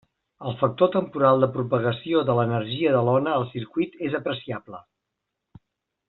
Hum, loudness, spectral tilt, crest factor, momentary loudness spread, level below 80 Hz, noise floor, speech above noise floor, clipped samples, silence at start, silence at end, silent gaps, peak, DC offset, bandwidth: none; -23 LUFS; -5.5 dB/octave; 20 dB; 14 LU; -64 dBFS; -82 dBFS; 59 dB; under 0.1%; 0.4 s; 1.3 s; none; -6 dBFS; under 0.1%; 4.2 kHz